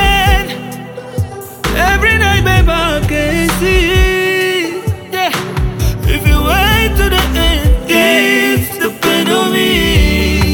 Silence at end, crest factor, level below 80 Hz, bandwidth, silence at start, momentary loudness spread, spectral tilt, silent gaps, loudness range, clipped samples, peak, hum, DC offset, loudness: 0 s; 12 dB; -18 dBFS; 19.5 kHz; 0 s; 10 LU; -4.5 dB/octave; none; 2 LU; under 0.1%; 0 dBFS; none; under 0.1%; -12 LUFS